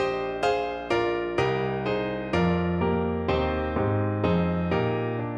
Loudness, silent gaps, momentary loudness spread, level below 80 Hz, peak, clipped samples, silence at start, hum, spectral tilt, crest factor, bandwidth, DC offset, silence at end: -26 LUFS; none; 3 LU; -42 dBFS; -12 dBFS; under 0.1%; 0 s; none; -7.5 dB/octave; 14 dB; 8.8 kHz; under 0.1%; 0 s